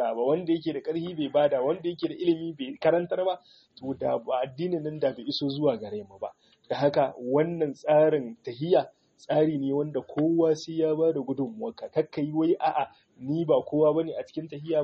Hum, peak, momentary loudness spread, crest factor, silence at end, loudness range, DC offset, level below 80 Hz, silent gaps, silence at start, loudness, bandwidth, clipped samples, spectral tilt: none; -10 dBFS; 12 LU; 16 dB; 0 s; 3 LU; under 0.1%; -70 dBFS; none; 0 s; -27 LUFS; 7.2 kHz; under 0.1%; -5.5 dB/octave